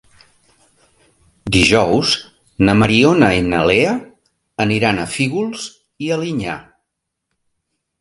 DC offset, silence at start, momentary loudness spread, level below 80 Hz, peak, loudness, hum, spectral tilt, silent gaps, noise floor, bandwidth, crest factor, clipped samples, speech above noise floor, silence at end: under 0.1%; 1.45 s; 15 LU; -40 dBFS; 0 dBFS; -15 LUFS; none; -5 dB/octave; none; -77 dBFS; 11.5 kHz; 18 dB; under 0.1%; 62 dB; 1.4 s